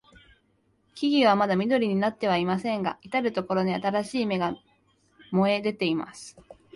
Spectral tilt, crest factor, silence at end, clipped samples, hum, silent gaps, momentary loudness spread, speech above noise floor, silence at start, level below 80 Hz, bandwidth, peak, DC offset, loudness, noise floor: -6 dB/octave; 18 dB; 0.25 s; under 0.1%; none; none; 10 LU; 43 dB; 0.95 s; -66 dBFS; 11.5 kHz; -10 dBFS; under 0.1%; -26 LUFS; -68 dBFS